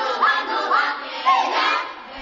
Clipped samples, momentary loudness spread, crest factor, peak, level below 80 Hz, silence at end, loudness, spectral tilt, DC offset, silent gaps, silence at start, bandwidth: under 0.1%; 6 LU; 16 dB; -4 dBFS; -68 dBFS; 0 s; -20 LUFS; -0.5 dB/octave; under 0.1%; none; 0 s; 7.6 kHz